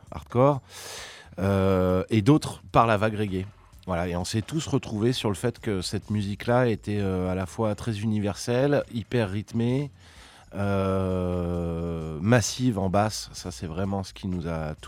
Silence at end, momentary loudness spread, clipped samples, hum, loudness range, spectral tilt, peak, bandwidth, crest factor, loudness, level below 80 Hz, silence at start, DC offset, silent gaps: 0 s; 10 LU; under 0.1%; none; 3 LU; -6 dB/octave; -6 dBFS; 16 kHz; 20 dB; -26 LUFS; -48 dBFS; 0.05 s; under 0.1%; none